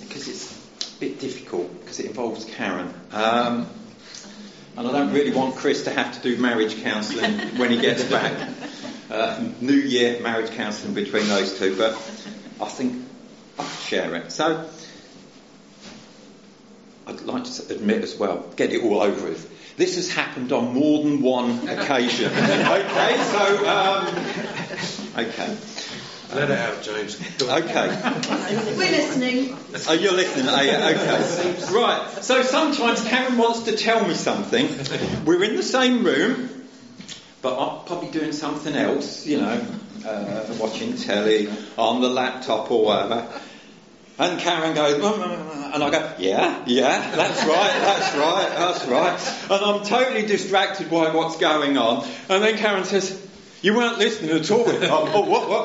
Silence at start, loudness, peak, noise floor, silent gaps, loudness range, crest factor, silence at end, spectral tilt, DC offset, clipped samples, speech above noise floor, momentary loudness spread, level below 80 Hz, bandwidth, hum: 0 s; -22 LUFS; -2 dBFS; -48 dBFS; none; 7 LU; 20 dB; 0 s; -2.5 dB/octave; under 0.1%; under 0.1%; 26 dB; 14 LU; -68 dBFS; 8 kHz; none